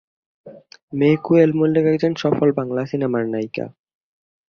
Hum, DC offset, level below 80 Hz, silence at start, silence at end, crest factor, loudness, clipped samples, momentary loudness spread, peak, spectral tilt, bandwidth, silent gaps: none; under 0.1%; -62 dBFS; 0.45 s; 0.8 s; 18 dB; -19 LUFS; under 0.1%; 13 LU; -2 dBFS; -8.5 dB/octave; 6.8 kHz; 0.83-0.88 s